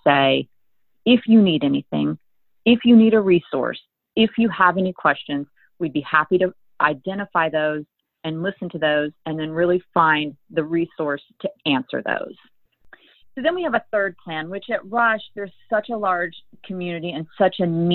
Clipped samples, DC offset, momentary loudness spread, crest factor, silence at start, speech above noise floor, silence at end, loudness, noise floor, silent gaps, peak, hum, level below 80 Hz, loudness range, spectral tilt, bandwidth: under 0.1%; under 0.1%; 14 LU; 18 dB; 0.05 s; 56 dB; 0 s; -21 LUFS; -76 dBFS; none; -2 dBFS; none; -60 dBFS; 7 LU; -9.5 dB/octave; 4.3 kHz